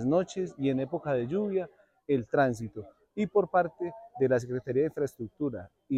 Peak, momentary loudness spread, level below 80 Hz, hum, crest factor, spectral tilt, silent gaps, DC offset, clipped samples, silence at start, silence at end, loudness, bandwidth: -14 dBFS; 13 LU; -66 dBFS; none; 16 dB; -7.5 dB/octave; none; under 0.1%; under 0.1%; 0 s; 0 s; -30 LUFS; 12 kHz